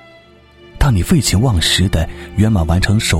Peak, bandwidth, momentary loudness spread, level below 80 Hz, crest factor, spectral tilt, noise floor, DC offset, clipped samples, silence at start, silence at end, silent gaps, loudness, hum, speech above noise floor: 0 dBFS; 16.5 kHz; 6 LU; -24 dBFS; 14 dB; -4.5 dB/octave; -44 dBFS; under 0.1%; under 0.1%; 0.75 s; 0 s; none; -14 LUFS; none; 30 dB